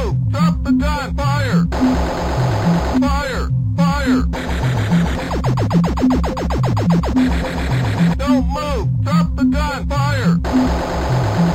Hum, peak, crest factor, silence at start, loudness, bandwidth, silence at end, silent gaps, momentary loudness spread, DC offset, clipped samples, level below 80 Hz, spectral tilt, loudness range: none; -4 dBFS; 12 dB; 0 s; -17 LUFS; 14 kHz; 0 s; none; 4 LU; under 0.1%; under 0.1%; -24 dBFS; -7 dB/octave; 1 LU